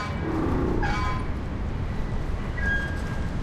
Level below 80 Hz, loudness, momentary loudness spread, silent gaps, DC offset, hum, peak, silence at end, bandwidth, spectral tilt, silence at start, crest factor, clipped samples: -30 dBFS; -28 LUFS; 6 LU; none; under 0.1%; none; -14 dBFS; 0 s; 11.5 kHz; -7 dB/octave; 0 s; 14 dB; under 0.1%